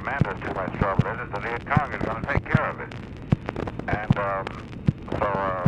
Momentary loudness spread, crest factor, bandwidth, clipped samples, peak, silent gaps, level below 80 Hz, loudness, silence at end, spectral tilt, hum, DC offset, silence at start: 7 LU; 20 dB; 8.8 kHz; under 0.1%; -4 dBFS; none; -40 dBFS; -26 LUFS; 0 s; -8.5 dB/octave; none; under 0.1%; 0 s